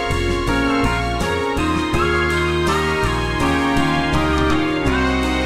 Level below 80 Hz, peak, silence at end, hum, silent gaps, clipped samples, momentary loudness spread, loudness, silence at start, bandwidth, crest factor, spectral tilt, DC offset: -26 dBFS; -4 dBFS; 0 s; none; none; under 0.1%; 2 LU; -18 LUFS; 0 s; 15.5 kHz; 14 dB; -5.5 dB/octave; under 0.1%